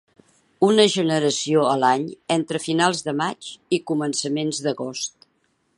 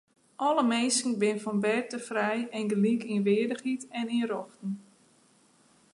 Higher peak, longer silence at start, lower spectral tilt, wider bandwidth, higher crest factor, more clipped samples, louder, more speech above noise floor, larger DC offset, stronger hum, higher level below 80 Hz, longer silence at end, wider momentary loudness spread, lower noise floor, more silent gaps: first, -2 dBFS vs -14 dBFS; first, 0.6 s vs 0.4 s; about the same, -4 dB/octave vs -4.5 dB/octave; about the same, 11.5 kHz vs 11.5 kHz; about the same, 20 dB vs 16 dB; neither; first, -21 LUFS vs -29 LUFS; first, 46 dB vs 35 dB; neither; neither; first, -70 dBFS vs -80 dBFS; second, 0.7 s vs 1.15 s; about the same, 10 LU vs 9 LU; first, -67 dBFS vs -63 dBFS; neither